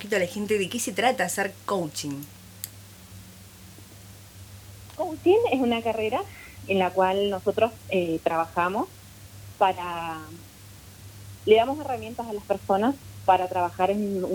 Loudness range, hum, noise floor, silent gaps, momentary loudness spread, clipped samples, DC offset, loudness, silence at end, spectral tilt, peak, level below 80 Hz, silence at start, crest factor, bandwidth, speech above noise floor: 8 LU; none; -47 dBFS; none; 24 LU; under 0.1%; under 0.1%; -25 LUFS; 0 s; -4.5 dB/octave; -6 dBFS; -56 dBFS; 0 s; 20 dB; over 20 kHz; 22 dB